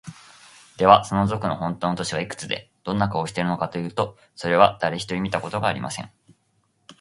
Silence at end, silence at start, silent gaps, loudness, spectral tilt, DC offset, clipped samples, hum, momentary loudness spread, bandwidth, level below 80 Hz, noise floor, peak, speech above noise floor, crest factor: 0.1 s; 0.05 s; none; -23 LUFS; -5.5 dB/octave; under 0.1%; under 0.1%; none; 13 LU; 11.5 kHz; -52 dBFS; -67 dBFS; 0 dBFS; 45 dB; 24 dB